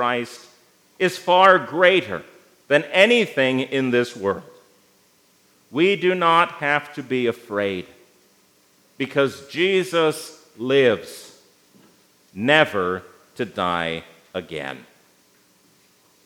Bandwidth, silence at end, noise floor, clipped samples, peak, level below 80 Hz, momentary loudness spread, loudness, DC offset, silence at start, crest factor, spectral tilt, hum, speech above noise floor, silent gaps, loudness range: 17 kHz; 1.45 s; -59 dBFS; under 0.1%; 0 dBFS; -70 dBFS; 17 LU; -20 LUFS; under 0.1%; 0 s; 22 dB; -4.5 dB/octave; none; 39 dB; none; 6 LU